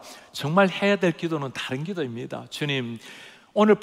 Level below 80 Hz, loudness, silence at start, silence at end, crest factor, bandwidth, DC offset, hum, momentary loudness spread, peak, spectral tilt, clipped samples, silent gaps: -70 dBFS; -25 LUFS; 0 s; 0 s; 20 dB; 15 kHz; under 0.1%; none; 16 LU; -6 dBFS; -6 dB/octave; under 0.1%; none